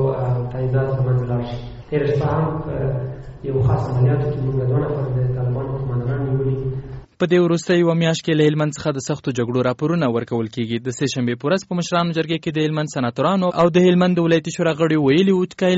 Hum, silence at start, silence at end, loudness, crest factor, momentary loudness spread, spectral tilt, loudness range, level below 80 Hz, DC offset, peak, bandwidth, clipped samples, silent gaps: none; 0 s; 0 s; -20 LUFS; 14 dB; 8 LU; -6.5 dB/octave; 4 LU; -42 dBFS; under 0.1%; -4 dBFS; 8 kHz; under 0.1%; none